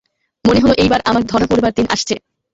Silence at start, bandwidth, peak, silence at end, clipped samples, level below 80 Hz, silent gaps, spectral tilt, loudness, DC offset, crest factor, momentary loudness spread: 0.45 s; 8 kHz; -2 dBFS; 0.35 s; under 0.1%; -36 dBFS; none; -5 dB/octave; -14 LUFS; under 0.1%; 14 dB; 7 LU